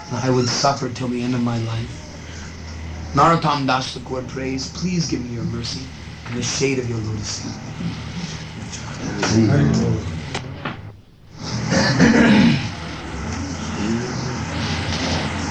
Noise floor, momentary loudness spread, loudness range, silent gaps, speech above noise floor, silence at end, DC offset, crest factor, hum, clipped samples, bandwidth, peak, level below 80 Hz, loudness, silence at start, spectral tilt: -42 dBFS; 16 LU; 6 LU; none; 21 dB; 0 s; 0.2%; 18 dB; none; under 0.1%; 9.4 kHz; -2 dBFS; -40 dBFS; -21 LUFS; 0 s; -5 dB/octave